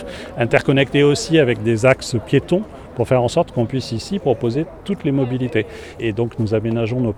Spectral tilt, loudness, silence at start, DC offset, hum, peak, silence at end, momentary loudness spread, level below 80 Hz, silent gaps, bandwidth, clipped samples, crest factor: -6 dB/octave; -18 LUFS; 0 s; under 0.1%; none; 0 dBFS; 0 s; 9 LU; -44 dBFS; none; 12.5 kHz; under 0.1%; 18 dB